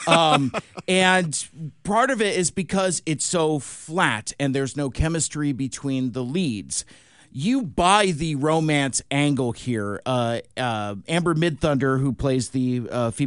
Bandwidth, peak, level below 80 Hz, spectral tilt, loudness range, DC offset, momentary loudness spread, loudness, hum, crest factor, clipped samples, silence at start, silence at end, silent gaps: 11 kHz; -2 dBFS; -44 dBFS; -4.5 dB/octave; 3 LU; 0.1%; 9 LU; -23 LUFS; none; 22 dB; under 0.1%; 0 s; 0 s; none